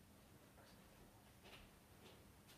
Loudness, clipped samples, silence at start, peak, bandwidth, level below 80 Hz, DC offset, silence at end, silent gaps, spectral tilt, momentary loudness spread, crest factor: -65 LUFS; under 0.1%; 0 s; -48 dBFS; 15 kHz; -76 dBFS; under 0.1%; 0 s; none; -4 dB/octave; 4 LU; 18 dB